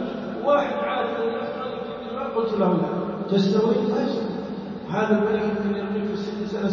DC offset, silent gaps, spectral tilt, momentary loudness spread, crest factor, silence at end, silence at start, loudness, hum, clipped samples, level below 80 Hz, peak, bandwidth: under 0.1%; none; -7.5 dB/octave; 9 LU; 16 dB; 0 s; 0 s; -24 LUFS; none; under 0.1%; -56 dBFS; -8 dBFS; 7 kHz